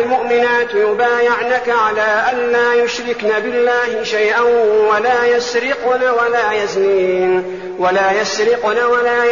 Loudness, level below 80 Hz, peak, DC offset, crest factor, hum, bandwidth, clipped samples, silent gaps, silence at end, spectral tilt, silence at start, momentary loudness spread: -14 LUFS; -54 dBFS; -4 dBFS; 0.3%; 10 dB; none; 7.4 kHz; under 0.1%; none; 0 s; -1 dB/octave; 0 s; 4 LU